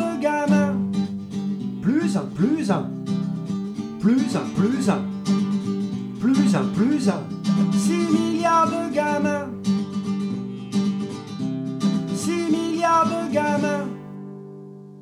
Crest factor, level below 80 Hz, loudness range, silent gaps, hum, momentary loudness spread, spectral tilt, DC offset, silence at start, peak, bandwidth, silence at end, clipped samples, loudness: 16 dB; -60 dBFS; 4 LU; none; none; 9 LU; -6.5 dB/octave; under 0.1%; 0 s; -6 dBFS; 12.5 kHz; 0 s; under 0.1%; -23 LUFS